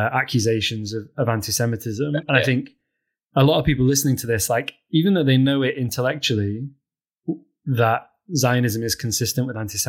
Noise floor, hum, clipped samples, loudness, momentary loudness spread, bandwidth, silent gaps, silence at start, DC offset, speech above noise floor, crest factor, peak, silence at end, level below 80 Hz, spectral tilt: -79 dBFS; none; under 0.1%; -21 LUFS; 11 LU; 17 kHz; none; 0 s; under 0.1%; 59 dB; 18 dB; -2 dBFS; 0 s; -46 dBFS; -4.5 dB/octave